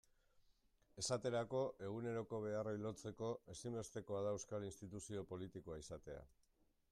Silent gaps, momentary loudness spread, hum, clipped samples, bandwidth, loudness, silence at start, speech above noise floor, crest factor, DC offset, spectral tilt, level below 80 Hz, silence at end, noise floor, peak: none; 11 LU; none; under 0.1%; 14 kHz; -47 LUFS; 0.95 s; 30 dB; 18 dB; under 0.1%; -5 dB/octave; -72 dBFS; 0.65 s; -76 dBFS; -28 dBFS